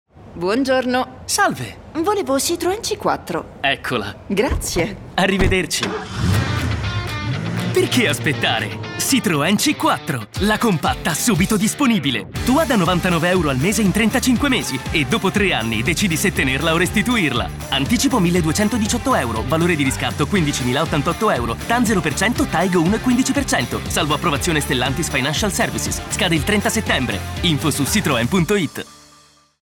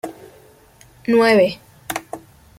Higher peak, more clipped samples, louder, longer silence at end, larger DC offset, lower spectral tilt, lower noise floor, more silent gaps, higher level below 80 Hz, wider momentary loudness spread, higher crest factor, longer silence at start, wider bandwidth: about the same, -4 dBFS vs -2 dBFS; neither; about the same, -18 LUFS vs -18 LUFS; first, 0.65 s vs 0.4 s; neither; about the same, -4 dB/octave vs -4.5 dB/octave; about the same, -51 dBFS vs -49 dBFS; neither; first, -34 dBFS vs -56 dBFS; second, 6 LU vs 22 LU; about the same, 14 dB vs 18 dB; about the same, 0.15 s vs 0.05 s; first, 19 kHz vs 16.5 kHz